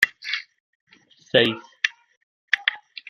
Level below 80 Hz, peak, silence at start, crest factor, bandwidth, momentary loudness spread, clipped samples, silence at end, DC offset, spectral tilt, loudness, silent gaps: -68 dBFS; 0 dBFS; 0 s; 26 dB; 14 kHz; 10 LU; under 0.1%; 0.3 s; under 0.1%; -3.5 dB/octave; -23 LUFS; 0.60-0.87 s, 2.17-2.48 s